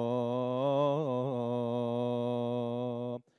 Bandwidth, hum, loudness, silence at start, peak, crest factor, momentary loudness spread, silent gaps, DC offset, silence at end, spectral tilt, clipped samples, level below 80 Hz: 10 kHz; none; -33 LUFS; 0 s; -18 dBFS; 14 dB; 6 LU; none; under 0.1%; 0.2 s; -9 dB/octave; under 0.1%; -82 dBFS